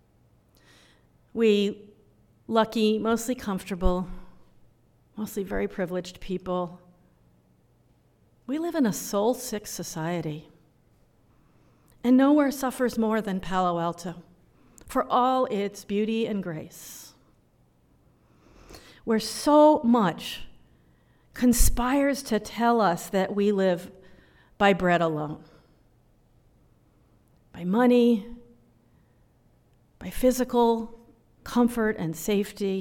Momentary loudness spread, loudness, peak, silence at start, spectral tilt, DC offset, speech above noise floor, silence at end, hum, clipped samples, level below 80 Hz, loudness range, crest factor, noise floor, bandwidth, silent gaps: 17 LU; -25 LUFS; -6 dBFS; 1.35 s; -5 dB/octave; under 0.1%; 39 dB; 0 s; none; under 0.1%; -42 dBFS; 8 LU; 20 dB; -63 dBFS; 18 kHz; none